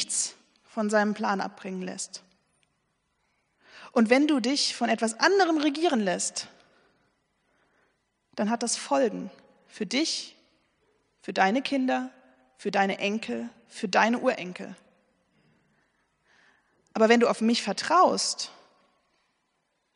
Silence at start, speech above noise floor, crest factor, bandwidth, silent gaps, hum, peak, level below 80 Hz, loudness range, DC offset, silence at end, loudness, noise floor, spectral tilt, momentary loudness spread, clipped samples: 0 s; 50 dB; 22 dB; 10.5 kHz; none; none; -6 dBFS; -80 dBFS; 7 LU; under 0.1%; 1.45 s; -26 LUFS; -75 dBFS; -3 dB/octave; 16 LU; under 0.1%